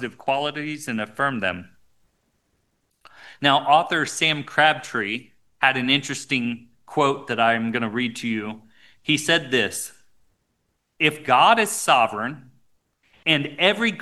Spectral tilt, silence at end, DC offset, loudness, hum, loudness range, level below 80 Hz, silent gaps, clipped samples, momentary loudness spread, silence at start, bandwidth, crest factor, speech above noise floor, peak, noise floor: -3 dB/octave; 0 s; 0.1%; -21 LUFS; none; 4 LU; -66 dBFS; none; under 0.1%; 12 LU; 0 s; 12.5 kHz; 22 dB; 51 dB; -2 dBFS; -72 dBFS